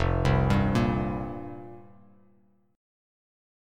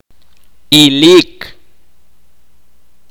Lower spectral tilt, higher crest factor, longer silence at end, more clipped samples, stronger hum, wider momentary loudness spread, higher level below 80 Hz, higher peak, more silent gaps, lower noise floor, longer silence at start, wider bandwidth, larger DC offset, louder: first, -7.5 dB/octave vs -4 dB/octave; first, 20 dB vs 14 dB; first, 1.95 s vs 1.65 s; neither; neither; second, 19 LU vs 26 LU; first, -38 dBFS vs -48 dBFS; second, -10 dBFS vs 0 dBFS; neither; first, -64 dBFS vs -56 dBFS; second, 0 s vs 0.7 s; second, 10 kHz vs over 20 kHz; second, under 0.1% vs 2%; second, -26 LUFS vs -7 LUFS